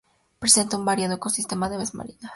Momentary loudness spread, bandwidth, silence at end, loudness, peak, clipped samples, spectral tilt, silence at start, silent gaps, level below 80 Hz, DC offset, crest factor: 13 LU; 12 kHz; 0 s; -22 LUFS; -2 dBFS; under 0.1%; -2.5 dB/octave; 0.4 s; none; -56 dBFS; under 0.1%; 24 dB